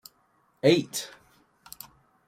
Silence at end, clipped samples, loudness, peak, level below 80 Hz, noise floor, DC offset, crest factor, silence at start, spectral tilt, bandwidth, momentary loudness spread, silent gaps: 1.2 s; under 0.1%; -25 LUFS; -8 dBFS; -70 dBFS; -67 dBFS; under 0.1%; 22 dB; 0.65 s; -4.5 dB/octave; 16.5 kHz; 24 LU; none